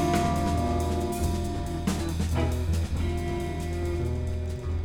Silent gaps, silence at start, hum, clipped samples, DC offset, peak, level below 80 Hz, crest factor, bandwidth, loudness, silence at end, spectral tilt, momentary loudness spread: none; 0 s; none; under 0.1%; under 0.1%; -12 dBFS; -34 dBFS; 16 dB; 17 kHz; -29 LUFS; 0 s; -6.5 dB/octave; 5 LU